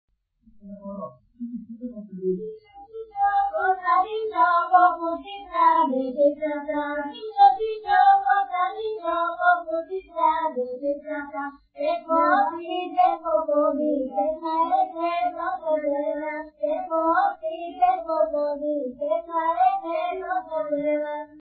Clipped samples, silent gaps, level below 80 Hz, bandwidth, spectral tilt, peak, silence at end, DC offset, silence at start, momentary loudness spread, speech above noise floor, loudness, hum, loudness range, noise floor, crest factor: under 0.1%; none; -64 dBFS; 4.7 kHz; -9 dB/octave; -6 dBFS; 0 s; under 0.1%; 0.65 s; 15 LU; 33 dB; -23 LUFS; none; 4 LU; -57 dBFS; 18 dB